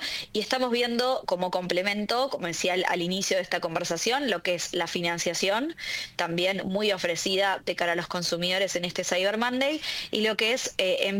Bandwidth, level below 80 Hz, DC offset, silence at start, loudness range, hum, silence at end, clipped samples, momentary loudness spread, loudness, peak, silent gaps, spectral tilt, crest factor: 17 kHz; -64 dBFS; under 0.1%; 0 s; 1 LU; none; 0 s; under 0.1%; 4 LU; -27 LUFS; -10 dBFS; none; -3 dB/octave; 18 dB